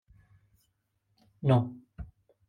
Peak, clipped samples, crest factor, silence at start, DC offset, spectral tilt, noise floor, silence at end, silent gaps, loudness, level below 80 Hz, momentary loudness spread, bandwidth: -14 dBFS; under 0.1%; 20 dB; 1.45 s; under 0.1%; -9.5 dB/octave; -76 dBFS; 0.45 s; none; -29 LUFS; -56 dBFS; 22 LU; 4.5 kHz